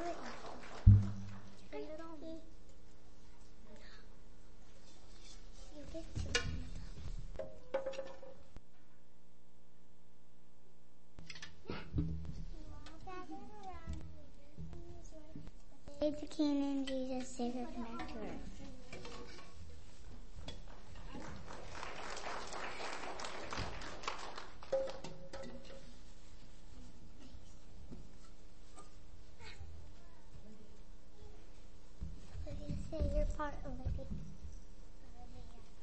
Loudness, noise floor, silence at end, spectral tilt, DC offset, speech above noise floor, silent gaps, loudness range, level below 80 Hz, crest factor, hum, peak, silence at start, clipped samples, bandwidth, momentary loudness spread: -42 LUFS; -68 dBFS; 0 s; -6 dB/octave; 0.8%; 29 dB; none; 17 LU; -48 dBFS; 32 dB; 60 Hz at -70 dBFS; -10 dBFS; 0 s; under 0.1%; 8.4 kHz; 22 LU